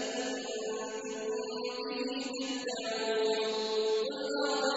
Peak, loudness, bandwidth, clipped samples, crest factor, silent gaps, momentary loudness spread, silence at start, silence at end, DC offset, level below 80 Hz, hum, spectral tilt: -18 dBFS; -34 LUFS; 8 kHz; under 0.1%; 16 dB; none; 6 LU; 0 s; 0 s; under 0.1%; -78 dBFS; none; -2 dB/octave